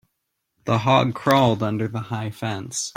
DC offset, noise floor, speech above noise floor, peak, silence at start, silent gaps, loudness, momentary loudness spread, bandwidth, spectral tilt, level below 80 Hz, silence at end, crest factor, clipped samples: under 0.1%; -77 dBFS; 56 dB; -2 dBFS; 0.65 s; none; -21 LUFS; 11 LU; 16.5 kHz; -5 dB/octave; -58 dBFS; 0.05 s; 20 dB; under 0.1%